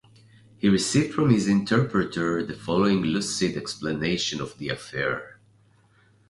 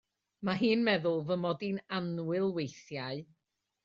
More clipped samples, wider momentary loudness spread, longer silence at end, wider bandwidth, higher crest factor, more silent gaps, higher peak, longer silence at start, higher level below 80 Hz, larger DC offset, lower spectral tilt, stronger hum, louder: neither; about the same, 9 LU vs 11 LU; first, 1 s vs 0.6 s; first, 11.5 kHz vs 7.4 kHz; about the same, 20 dB vs 18 dB; neither; first, -6 dBFS vs -16 dBFS; first, 0.65 s vs 0.4 s; first, -54 dBFS vs -74 dBFS; neither; about the same, -5 dB/octave vs -4.5 dB/octave; neither; first, -25 LUFS vs -33 LUFS